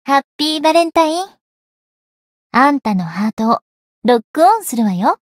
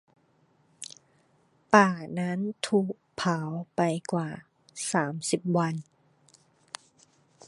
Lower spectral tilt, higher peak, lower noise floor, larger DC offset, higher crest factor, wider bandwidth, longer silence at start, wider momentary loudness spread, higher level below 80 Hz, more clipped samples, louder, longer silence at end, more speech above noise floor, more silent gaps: about the same, -5 dB/octave vs -5 dB/octave; about the same, 0 dBFS vs -2 dBFS; first, under -90 dBFS vs -66 dBFS; neither; second, 16 dB vs 28 dB; first, 16 kHz vs 11.5 kHz; second, 0.05 s vs 0.8 s; second, 7 LU vs 22 LU; first, -60 dBFS vs -72 dBFS; neither; first, -15 LUFS vs -28 LUFS; second, 0.15 s vs 1.65 s; first, over 76 dB vs 39 dB; first, 0.24-0.39 s, 1.41-2.50 s, 3.33-3.37 s, 3.62-4.02 s, 4.24-4.34 s vs none